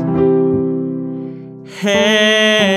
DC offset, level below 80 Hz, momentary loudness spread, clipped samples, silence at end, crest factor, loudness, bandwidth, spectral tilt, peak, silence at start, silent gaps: under 0.1%; -50 dBFS; 18 LU; under 0.1%; 0 s; 14 dB; -14 LUFS; 14 kHz; -4.5 dB/octave; 0 dBFS; 0 s; none